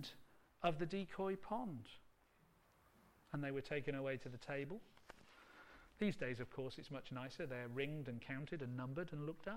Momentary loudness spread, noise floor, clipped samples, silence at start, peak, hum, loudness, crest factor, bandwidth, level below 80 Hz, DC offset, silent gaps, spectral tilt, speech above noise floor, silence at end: 19 LU; -73 dBFS; under 0.1%; 0 s; -24 dBFS; none; -46 LUFS; 22 dB; 16.5 kHz; -68 dBFS; under 0.1%; none; -7 dB/octave; 28 dB; 0 s